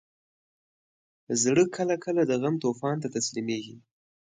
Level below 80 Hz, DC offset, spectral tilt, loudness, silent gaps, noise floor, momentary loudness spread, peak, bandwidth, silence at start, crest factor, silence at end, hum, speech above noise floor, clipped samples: -72 dBFS; under 0.1%; -4.5 dB/octave; -27 LUFS; none; under -90 dBFS; 9 LU; -10 dBFS; 9.6 kHz; 1.3 s; 18 dB; 0.55 s; none; over 63 dB; under 0.1%